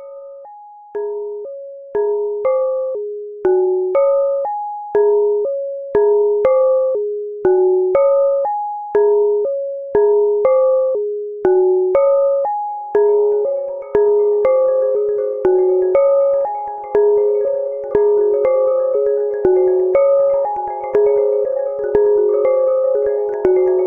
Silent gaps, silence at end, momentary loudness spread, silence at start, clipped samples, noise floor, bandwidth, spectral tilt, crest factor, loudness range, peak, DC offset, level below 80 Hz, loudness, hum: none; 0 s; 9 LU; 0 s; under 0.1%; -38 dBFS; 2.9 kHz; -9.5 dB/octave; 14 dB; 2 LU; -2 dBFS; under 0.1%; -54 dBFS; -16 LUFS; none